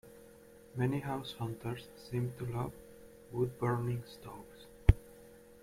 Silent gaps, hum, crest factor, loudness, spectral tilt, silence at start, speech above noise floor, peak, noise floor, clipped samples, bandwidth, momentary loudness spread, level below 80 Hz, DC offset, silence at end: none; none; 28 dB; -37 LUFS; -7.5 dB/octave; 0.05 s; 20 dB; -8 dBFS; -57 dBFS; under 0.1%; 16 kHz; 25 LU; -42 dBFS; under 0.1%; 0.1 s